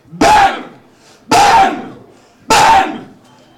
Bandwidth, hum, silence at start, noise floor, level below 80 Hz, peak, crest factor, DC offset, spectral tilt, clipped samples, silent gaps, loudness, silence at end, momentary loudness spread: 18 kHz; none; 0.15 s; -44 dBFS; -38 dBFS; -2 dBFS; 12 dB; under 0.1%; -2.5 dB/octave; under 0.1%; none; -10 LUFS; 0.55 s; 18 LU